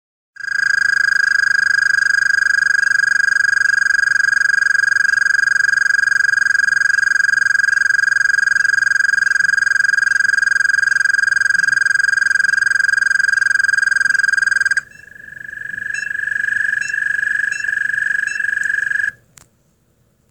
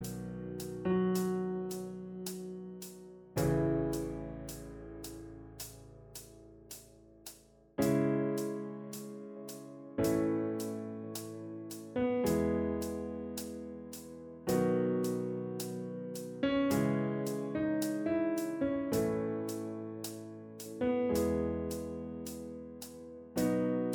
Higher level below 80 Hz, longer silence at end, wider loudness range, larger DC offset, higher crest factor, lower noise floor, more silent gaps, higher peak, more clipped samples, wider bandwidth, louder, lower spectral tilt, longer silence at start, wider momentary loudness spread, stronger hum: about the same, -60 dBFS vs -56 dBFS; first, 1.2 s vs 0 s; about the same, 5 LU vs 4 LU; neither; second, 10 dB vs 18 dB; about the same, -59 dBFS vs -58 dBFS; neither; first, -6 dBFS vs -18 dBFS; neither; second, 10 kHz vs over 20 kHz; first, -13 LUFS vs -36 LUFS; second, 2 dB/octave vs -6 dB/octave; first, 0.4 s vs 0 s; second, 5 LU vs 16 LU; neither